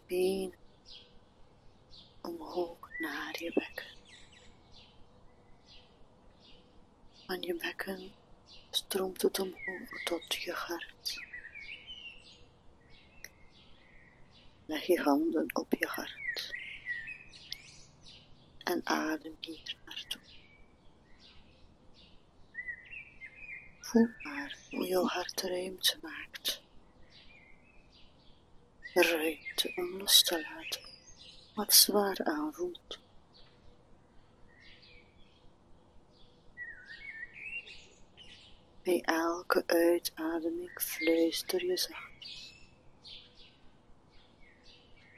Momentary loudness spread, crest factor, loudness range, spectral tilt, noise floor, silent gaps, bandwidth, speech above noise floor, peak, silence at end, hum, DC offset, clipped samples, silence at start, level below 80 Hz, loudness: 23 LU; 30 dB; 17 LU; -2 dB/octave; -59 dBFS; none; 13.5 kHz; 27 dB; -6 dBFS; 0.25 s; none; under 0.1%; under 0.1%; 0.1 s; -64 dBFS; -33 LUFS